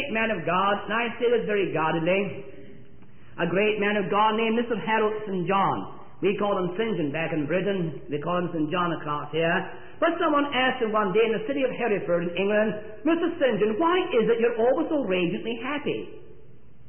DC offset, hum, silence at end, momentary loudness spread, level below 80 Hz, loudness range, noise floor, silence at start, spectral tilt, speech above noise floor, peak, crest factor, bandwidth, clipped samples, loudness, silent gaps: 1%; none; 0.55 s; 7 LU; -60 dBFS; 3 LU; -53 dBFS; 0 s; -10.5 dB/octave; 28 dB; -10 dBFS; 14 dB; 3.4 kHz; under 0.1%; -25 LUFS; none